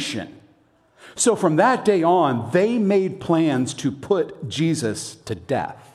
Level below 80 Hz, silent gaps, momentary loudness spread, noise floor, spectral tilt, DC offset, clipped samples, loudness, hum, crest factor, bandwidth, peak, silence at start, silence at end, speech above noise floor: -60 dBFS; none; 13 LU; -58 dBFS; -5 dB/octave; under 0.1%; under 0.1%; -21 LUFS; none; 18 dB; 13 kHz; -4 dBFS; 0 s; 0.15 s; 38 dB